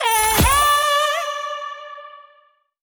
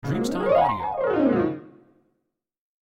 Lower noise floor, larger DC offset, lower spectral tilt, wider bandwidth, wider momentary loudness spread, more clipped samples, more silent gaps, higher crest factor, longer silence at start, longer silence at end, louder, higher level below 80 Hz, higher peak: second, -57 dBFS vs -77 dBFS; neither; second, -2.5 dB/octave vs -7 dB/octave; first, over 20 kHz vs 16 kHz; first, 20 LU vs 7 LU; neither; neither; about the same, 14 dB vs 16 dB; about the same, 0 s vs 0.05 s; second, 0.65 s vs 1.1 s; first, -17 LUFS vs -23 LUFS; first, -34 dBFS vs -52 dBFS; first, -4 dBFS vs -8 dBFS